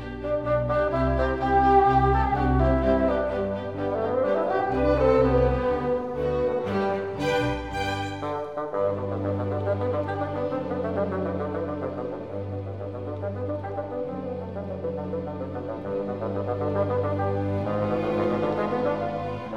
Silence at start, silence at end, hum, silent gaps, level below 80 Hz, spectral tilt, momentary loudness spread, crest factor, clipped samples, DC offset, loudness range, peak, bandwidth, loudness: 0 s; 0 s; none; none; -38 dBFS; -8 dB/octave; 11 LU; 18 dB; under 0.1%; 0.2%; 9 LU; -8 dBFS; 10 kHz; -26 LUFS